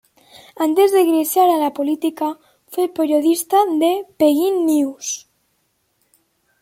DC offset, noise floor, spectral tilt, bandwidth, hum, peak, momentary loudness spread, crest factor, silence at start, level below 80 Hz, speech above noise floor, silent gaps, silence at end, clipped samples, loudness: under 0.1%; -67 dBFS; -3 dB/octave; 16.5 kHz; none; -4 dBFS; 11 LU; 14 dB; 0.6 s; -70 dBFS; 50 dB; none; 1.4 s; under 0.1%; -17 LUFS